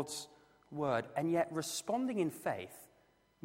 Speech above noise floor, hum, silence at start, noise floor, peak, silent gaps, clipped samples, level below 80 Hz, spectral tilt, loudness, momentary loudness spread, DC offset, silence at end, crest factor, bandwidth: 34 dB; none; 0 s; -71 dBFS; -20 dBFS; none; under 0.1%; -76 dBFS; -4.5 dB/octave; -37 LUFS; 15 LU; under 0.1%; 0.6 s; 18 dB; 16 kHz